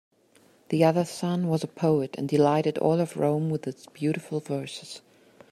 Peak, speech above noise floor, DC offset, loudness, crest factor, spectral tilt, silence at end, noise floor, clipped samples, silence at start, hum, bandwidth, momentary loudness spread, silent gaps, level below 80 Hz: -8 dBFS; 35 dB; under 0.1%; -26 LUFS; 18 dB; -7 dB/octave; 0.55 s; -60 dBFS; under 0.1%; 0.7 s; none; 14 kHz; 12 LU; none; -68 dBFS